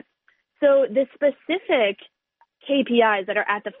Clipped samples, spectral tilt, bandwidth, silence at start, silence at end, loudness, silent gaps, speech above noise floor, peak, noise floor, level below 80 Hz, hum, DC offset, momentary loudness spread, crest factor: under 0.1%; -1.5 dB/octave; 4 kHz; 0.6 s; 0.1 s; -21 LUFS; none; 45 dB; -6 dBFS; -66 dBFS; -74 dBFS; none; under 0.1%; 7 LU; 16 dB